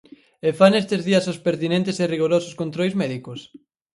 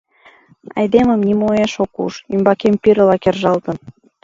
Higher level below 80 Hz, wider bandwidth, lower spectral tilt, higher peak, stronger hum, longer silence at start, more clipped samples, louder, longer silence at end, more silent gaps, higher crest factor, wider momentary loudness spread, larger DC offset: second, -64 dBFS vs -48 dBFS; first, 11.5 kHz vs 7.6 kHz; about the same, -6 dB/octave vs -7 dB/octave; about the same, 0 dBFS vs 0 dBFS; neither; second, 0.45 s vs 0.75 s; neither; second, -21 LUFS vs -15 LUFS; about the same, 0.35 s vs 0.35 s; neither; about the same, 20 dB vs 16 dB; about the same, 12 LU vs 11 LU; neither